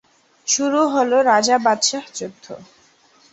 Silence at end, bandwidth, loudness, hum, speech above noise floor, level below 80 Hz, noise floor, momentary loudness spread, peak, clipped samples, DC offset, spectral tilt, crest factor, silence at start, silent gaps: 0.7 s; 8.2 kHz; -17 LUFS; none; 36 dB; -68 dBFS; -54 dBFS; 21 LU; -2 dBFS; under 0.1%; under 0.1%; -1.5 dB/octave; 18 dB; 0.45 s; none